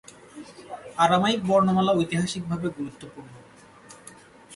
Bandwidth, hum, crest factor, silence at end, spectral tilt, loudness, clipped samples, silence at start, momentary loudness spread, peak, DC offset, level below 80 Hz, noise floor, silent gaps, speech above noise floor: 11.5 kHz; none; 20 dB; 0 s; -5.5 dB/octave; -23 LUFS; under 0.1%; 0.35 s; 25 LU; -8 dBFS; under 0.1%; -60 dBFS; -49 dBFS; none; 26 dB